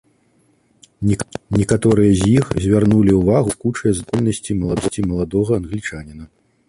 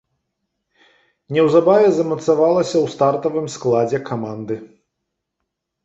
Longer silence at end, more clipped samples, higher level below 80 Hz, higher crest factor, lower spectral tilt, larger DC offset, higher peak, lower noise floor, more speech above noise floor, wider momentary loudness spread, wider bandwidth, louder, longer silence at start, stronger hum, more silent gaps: second, 0.45 s vs 1.2 s; neither; first, -36 dBFS vs -62 dBFS; about the same, 16 dB vs 18 dB; about the same, -7 dB/octave vs -6.5 dB/octave; neither; about the same, -2 dBFS vs -2 dBFS; second, -59 dBFS vs -78 dBFS; second, 42 dB vs 61 dB; second, 10 LU vs 13 LU; first, 11.5 kHz vs 8 kHz; about the same, -17 LUFS vs -17 LUFS; second, 1 s vs 1.3 s; neither; neither